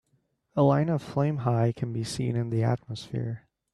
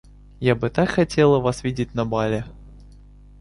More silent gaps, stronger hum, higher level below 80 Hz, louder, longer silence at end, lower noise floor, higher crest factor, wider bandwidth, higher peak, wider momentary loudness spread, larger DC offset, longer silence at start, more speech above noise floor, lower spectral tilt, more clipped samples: neither; second, none vs 50 Hz at -40 dBFS; second, -60 dBFS vs -44 dBFS; second, -28 LUFS vs -21 LUFS; second, 0.35 s vs 0.5 s; first, -72 dBFS vs -46 dBFS; about the same, 18 dB vs 18 dB; about the same, 11.5 kHz vs 11.5 kHz; second, -10 dBFS vs -4 dBFS; about the same, 11 LU vs 9 LU; neither; first, 0.55 s vs 0.4 s; first, 45 dB vs 26 dB; about the same, -7.5 dB/octave vs -6.5 dB/octave; neither